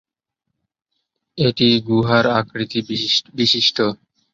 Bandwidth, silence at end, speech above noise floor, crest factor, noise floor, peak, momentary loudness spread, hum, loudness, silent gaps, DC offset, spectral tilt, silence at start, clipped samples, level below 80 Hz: 7.6 kHz; 0.4 s; 61 dB; 18 dB; -79 dBFS; -2 dBFS; 8 LU; none; -17 LUFS; none; under 0.1%; -5 dB/octave; 1.35 s; under 0.1%; -54 dBFS